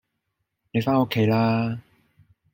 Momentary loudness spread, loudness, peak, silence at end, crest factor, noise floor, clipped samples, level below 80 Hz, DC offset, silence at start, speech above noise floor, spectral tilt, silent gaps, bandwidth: 9 LU; -23 LUFS; -8 dBFS; 0.75 s; 18 dB; -78 dBFS; under 0.1%; -60 dBFS; under 0.1%; 0.75 s; 57 dB; -8 dB/octave; none; 16.5 kHz